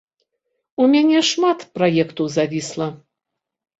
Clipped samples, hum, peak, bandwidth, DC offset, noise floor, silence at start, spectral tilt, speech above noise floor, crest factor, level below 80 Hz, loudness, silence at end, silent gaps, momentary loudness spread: under 0.1%; none; -4 dBFS; 8 kHz; under 0.1%; -82 dBFS; 0.8 s; -4.5 dB/octave; 64 dB; 16 dB; -62 dBFS; -18 LUFS; 0.85 s; none; 12 LU